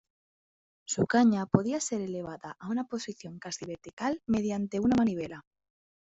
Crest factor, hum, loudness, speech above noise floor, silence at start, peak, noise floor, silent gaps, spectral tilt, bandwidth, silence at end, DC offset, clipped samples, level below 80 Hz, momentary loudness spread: 24 dB; none; -30 LUFS; over 60 dB; 0.9 s; -8 dBFS; under -90 dBFS; 3.93-3.97 s; -5.5 dB/octave; 8 kHz; 0.65 s; under 0.1%; under 0.1%; -62 dBFS; 17 LU